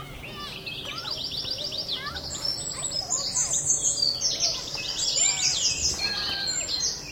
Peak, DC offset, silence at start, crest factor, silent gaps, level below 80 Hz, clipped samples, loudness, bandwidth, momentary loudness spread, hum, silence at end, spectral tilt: -10 dBFS; under 0.1%; 0 s; 18 dB; none; -50 dBFS; under 0.1%; -25 LUFS; over 20 kHz; 11 LU; none; 0 s; 0 dB/octave